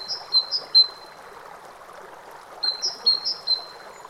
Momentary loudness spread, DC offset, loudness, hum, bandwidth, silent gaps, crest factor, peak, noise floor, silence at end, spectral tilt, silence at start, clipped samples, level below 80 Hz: 26 LU; under 0.1%; -20 LUFS; none; 15.5 kHz; none; 18 dB; -8 dBFS; -43 dBFS; 0 s; 1 dB/octave; 0 s; under 0.1%; -68 dBFS